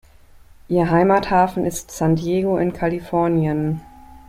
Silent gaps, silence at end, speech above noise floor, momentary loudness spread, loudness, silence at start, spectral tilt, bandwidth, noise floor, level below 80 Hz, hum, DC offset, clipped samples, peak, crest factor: none; 0.1 s; 28 dB; 8 LU; -19 LUFS; 0.7 s; -7 dB/octave; 15.5 kHz; -46 dBFS; -44 dBFS; none; under 0.1%; under 0.1%; -2 dBFS; 16 dB